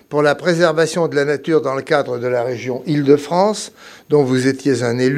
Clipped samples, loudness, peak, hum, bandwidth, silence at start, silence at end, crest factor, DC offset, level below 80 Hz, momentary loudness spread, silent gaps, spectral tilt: under 0.1%; -17 LUFS; 0 dBFS; none; 14 kHz; 0.1 s; 0 s; 16 dB; under 0.1%; -68 dBFS; 6 LU; none; -5.5 dB/octave